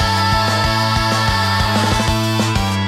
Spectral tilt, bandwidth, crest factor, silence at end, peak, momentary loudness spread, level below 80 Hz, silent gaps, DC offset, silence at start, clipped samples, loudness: -4.5 dB/octave; 16 kHz; 12 dB; 0 s; -4 dBFS; 2 LU; -28 dBFS; none; under 0.1%; 0 s; under 0.1%; -15 LUFS